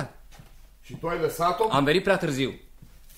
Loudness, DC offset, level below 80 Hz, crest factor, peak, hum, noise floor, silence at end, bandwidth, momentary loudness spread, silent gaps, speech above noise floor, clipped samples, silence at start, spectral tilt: -25 LUFS; under 0.1%; -48 dBFS; 20 dB; -8 dBFS; none; -49 dBFS; 0.05 s; 16 kHz; 17 LU; none; 24 dB; under 0.1%; 0 s; -5 dB/octave